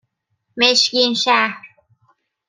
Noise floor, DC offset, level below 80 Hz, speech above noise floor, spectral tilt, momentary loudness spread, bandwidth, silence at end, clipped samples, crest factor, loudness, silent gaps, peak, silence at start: -71 dBFS; under 0.1%; -72 dBFS; 55 dB; -1 dB/octave; 19 LU; 12 kHz; 0.8 s; under 0.1%; 20 dB; -15 LUFS; none; 0 dBFS; 0.55 s